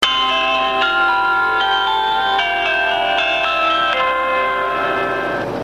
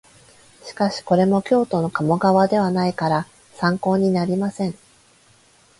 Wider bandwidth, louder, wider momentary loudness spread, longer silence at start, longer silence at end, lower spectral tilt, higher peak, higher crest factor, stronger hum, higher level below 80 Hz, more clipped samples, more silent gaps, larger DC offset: first, 14 kHz vs 11.5 kHz; first, -16 LUFS vs -20 LUFS; second, 3 LU vs 10 LU; second, 0 s vs 0.65 s; second, 0 s vs 1.05 s; second, -2.5 dB/octave vs -7 dB/octave; about the same, -2 dBFS vs -4 dBFS; about the same, 14 dB vs 16 dB; neither; first, -46 dBFS vs -58 dBFS; neither; neither; neither